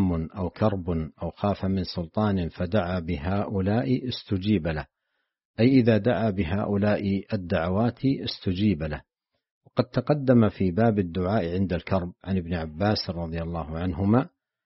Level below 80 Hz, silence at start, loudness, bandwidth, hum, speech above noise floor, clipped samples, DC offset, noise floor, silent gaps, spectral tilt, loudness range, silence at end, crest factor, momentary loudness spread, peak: -46 dBFS; 0 s; -26 LUFS; 5.8 kHz; none; 54 dB; under 0.1%; under 0.1%; -79 dBFS; 5.45-5.54 s, 9.51-9.61 s; -6.5 dB/octave; 3 LU; 0.4 s; 18 dB; 10 LU; -6 dBFS